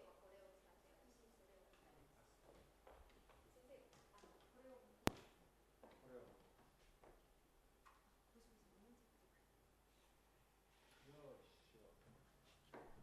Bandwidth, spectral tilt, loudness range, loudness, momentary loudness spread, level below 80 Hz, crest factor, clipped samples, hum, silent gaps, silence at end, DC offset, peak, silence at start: 13 kHz; -4.5 dB/octave; 14 LU; -55 LUFS; 22 LU; -74 dBFS; 48 dB; under 0.1%; none; none; 0 s; under 0.1%; -14 dBFS; 0 s